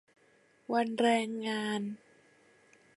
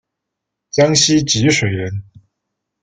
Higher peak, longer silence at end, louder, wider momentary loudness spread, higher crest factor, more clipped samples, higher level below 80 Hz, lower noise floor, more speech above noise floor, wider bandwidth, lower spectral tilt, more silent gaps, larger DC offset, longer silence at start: second, -14 dBFS vs 0 dBFS; first, 1 s vs 0.8 s; second, -32 LUFS vs -14 LUFS; first, 17 LU vs 13 LU; about the same, 20 dB vs 18 dB; neither; second, -84 dBFS vs -48 dBFS; second, -66 dBFS vs -79 dBFS; second, 35 dB vs 65 dB; first, 11.5 kHz vs 9.6 kHz; about the same, -4.5 dB/octave vs -3.5 dB/octave; neither; neither; about the same, 0.7 s vs 0.75 s